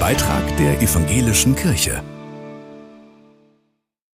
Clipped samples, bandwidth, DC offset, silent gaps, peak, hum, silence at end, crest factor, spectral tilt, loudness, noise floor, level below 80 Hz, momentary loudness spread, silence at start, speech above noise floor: under 0.1%; 16 kHz; under 0.1%; none; -4 dBFS; none; 1.3 s; 16 dB; -4.5 dB/octave; -17 LUFS; -69 dBFS; -32 dBFS; 20 LU; 0 s; 52 dB